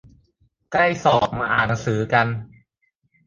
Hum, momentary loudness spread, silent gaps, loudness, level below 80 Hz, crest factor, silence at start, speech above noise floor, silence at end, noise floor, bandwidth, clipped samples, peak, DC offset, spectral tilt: none; 7 LU; none; -20 LUFS; -50 dBFS; 20 dB; 0.7 s; 50 dB; 0.8 s; -70 dBFS; 7.6 kHz; under 0.1%; -2 dBFS; under 0.1%; -5.5 dB/octave